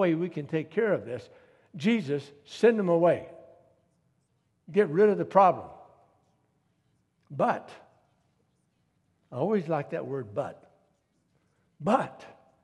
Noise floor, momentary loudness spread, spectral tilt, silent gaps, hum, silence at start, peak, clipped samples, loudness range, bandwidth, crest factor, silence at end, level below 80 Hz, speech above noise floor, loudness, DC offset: -73 dBFS; 17 LU; -7.5 dB/octave; none; none; 0 s; -8 dBFS; under 0.1%; 10 LU; 11 kHz; 22 dB; 0.35 s; -72 dBFS; 46 dB; -27 LUFS; under 0.1%